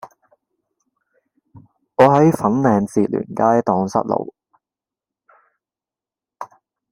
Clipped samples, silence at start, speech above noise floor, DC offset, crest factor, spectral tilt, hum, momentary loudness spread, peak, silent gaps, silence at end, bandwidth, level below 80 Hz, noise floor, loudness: under 0.1%; 0.05 s; 74 dB; under 0.1%; 20 dB; -8 dB/octave; none; 24 LU; 0 dBFS; none; 0.45 s; 16 kHz; -60 dBFS; -90 dBFS; -17 LUFS